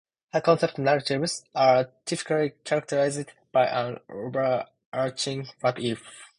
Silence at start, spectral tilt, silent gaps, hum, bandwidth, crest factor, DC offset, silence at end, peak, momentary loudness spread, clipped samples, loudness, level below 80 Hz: 0.35 s; -4.5 dB/octave; 4.86-4.92 s; none; 11 kHz; 20 dB; under 0.1%; 0.15 s; -6 dBFS; 10 LU; under 0.1%; -26 LUFS; -68 dBFS